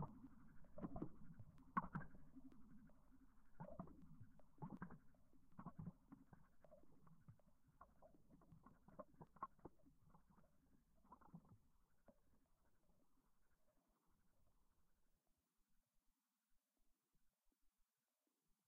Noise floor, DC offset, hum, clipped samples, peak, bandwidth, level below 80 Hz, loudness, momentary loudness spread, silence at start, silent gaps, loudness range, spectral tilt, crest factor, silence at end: under -90 dBFS; under 0.1%; none; under 0.1%; -30 dBFS; 2.4 kHz; -74 dBFS; -58 LUFS; 17 LU; 0 s; none; 9 LU; -4.5 dB/octave; 30 dB; 0.15 s